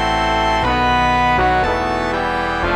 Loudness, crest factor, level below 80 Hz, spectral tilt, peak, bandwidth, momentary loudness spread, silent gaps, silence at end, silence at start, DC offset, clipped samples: -16 LUFS; 12 dB; -28 dBFS; -5 dB/octave; -4 dBFS; 15.5 kHz; 4 LU; none; 0 s; 0 s; under 0.1%; under 0.1%